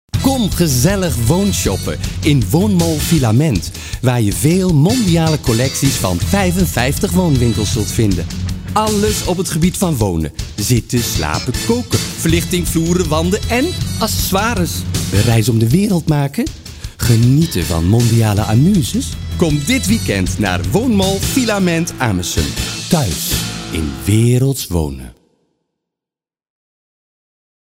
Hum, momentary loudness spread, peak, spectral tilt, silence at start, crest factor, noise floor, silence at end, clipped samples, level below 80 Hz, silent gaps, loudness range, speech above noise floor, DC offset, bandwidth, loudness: none; 7 LU; 0 dBFS; -5 dB/octave; 0.15 s; 14 dB; -89 dBFS; 2.5 s; under 0.1%; -28 dBFS; none; 3 LU; 75 dB; under 0.1%; 16.5 kHz; -15 LUFS